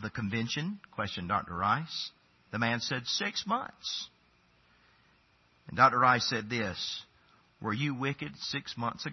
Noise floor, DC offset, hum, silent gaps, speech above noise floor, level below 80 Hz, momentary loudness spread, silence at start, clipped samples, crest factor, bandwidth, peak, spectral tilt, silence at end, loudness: -67 dBFS; under 0.1%; none; none; 35 dB; -68 dBFS; 13 LU; 0 s; under 0.1%; 24 dB; 6.2 kHz; -10 dBFS; -2.5 dB/octave; 0 s; -31 LUFS